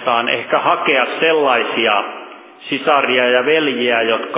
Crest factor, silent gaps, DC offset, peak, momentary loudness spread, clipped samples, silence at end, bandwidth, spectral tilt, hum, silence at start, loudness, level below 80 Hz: 16 dB; none; under 0.1%; 0 dBFS; 7 LU; under 0.1%; 0 s; 4 kHz; -7 dB/octave; none; 0 s; -15 LUFS; -78 dBFS